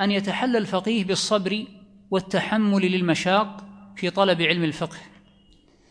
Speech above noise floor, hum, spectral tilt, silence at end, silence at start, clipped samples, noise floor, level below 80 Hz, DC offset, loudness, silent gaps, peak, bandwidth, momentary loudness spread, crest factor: 34 dB; none; -5 dB/octave; 0.85 s; 0 s; under 0.1%; -56 dBFS; -62 dBFS; under 0.1%; -23 LUFS; none; -4 dBFS; 10.5 kHz; 12 LU; 20 dB